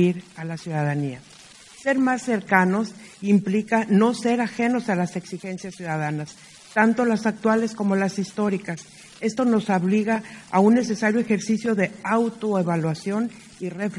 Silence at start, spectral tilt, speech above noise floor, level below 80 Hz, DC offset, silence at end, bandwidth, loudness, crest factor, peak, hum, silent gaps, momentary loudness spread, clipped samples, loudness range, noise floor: 0 s; -6.5 dB/octave; 24 dB; -66 dBFS; under 0.1%; 0 s; 12 kHz; -23 LUFS; 20 dB; -2 dBFS; none; none; 13 LU; under 0.1%; 2 LU; -46 dBFS